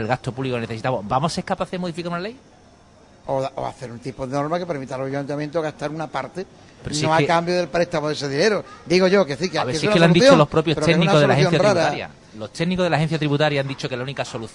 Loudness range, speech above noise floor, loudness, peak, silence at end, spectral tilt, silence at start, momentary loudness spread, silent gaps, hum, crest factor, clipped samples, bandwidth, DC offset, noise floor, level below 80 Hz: 11 LU; 30 dB; -20 LUFS; 0 dBFS; 0.05 s; -5.5 dB/octave; 0 s; 15 LU; none; none; 20 dB; under 0.1%; 11 kHz; under 0.1%; -50 dBFS; -50 dBFS